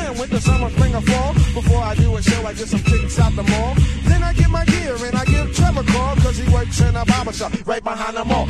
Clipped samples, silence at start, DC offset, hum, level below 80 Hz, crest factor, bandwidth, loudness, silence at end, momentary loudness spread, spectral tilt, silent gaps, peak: under 0.1%; 0 s; under 0.1%; none; -22 dBFS; 16 dB; 12.5 kHz; -18 LUFS; 0 s; 6 LU; -6 dB/octave; none; 0 dBFS